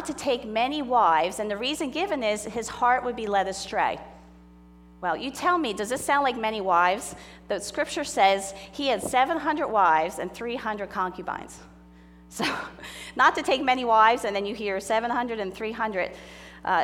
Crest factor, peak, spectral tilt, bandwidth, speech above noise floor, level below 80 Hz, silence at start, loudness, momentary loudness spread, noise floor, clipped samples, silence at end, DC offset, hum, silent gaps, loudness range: 20 dB; -6 dBFS; -3 dB/octave; 17 kHz; 25 dB; -56 dBFS; 0 s; -25 LUFS; 13 LU; -51 dBFS; under 0.1%; 0 s; under 0.1%; 60 Hz at -50 dBFS; none; 4 LU